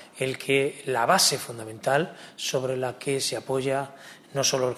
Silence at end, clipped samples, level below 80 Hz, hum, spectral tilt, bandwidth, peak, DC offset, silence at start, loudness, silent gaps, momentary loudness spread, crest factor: 0 s; under 0.1%; -68 dBFS; none; -3 dB/octave; 14 kHz; -6 dBFS; under 0.1%; 0 s; -26 LUFS; none; 13 LU; 20 dB